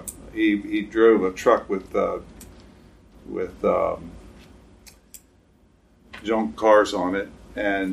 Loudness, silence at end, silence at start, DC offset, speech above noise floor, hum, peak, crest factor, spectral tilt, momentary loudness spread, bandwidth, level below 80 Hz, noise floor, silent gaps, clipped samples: -22 LUFS; 0 s; 0 s; under 0.1%; 36 dB; none; -4 dBFS; 20 dB; -5 dB/octave; 17 LU; 15.5 kHz; -50 dBFS; -58 dBFS; none; under 0.1%